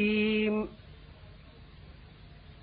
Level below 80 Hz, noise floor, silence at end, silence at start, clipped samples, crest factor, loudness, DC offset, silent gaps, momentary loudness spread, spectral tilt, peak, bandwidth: -54 dBFS; -52 dBFS; 0.3 s; 0 s; under 0.1%; 16 dB; -29 LUFS; under 0.1%; none; 26 LU; -9.5 dB/octave; -18 dBFS; 4.9 kHz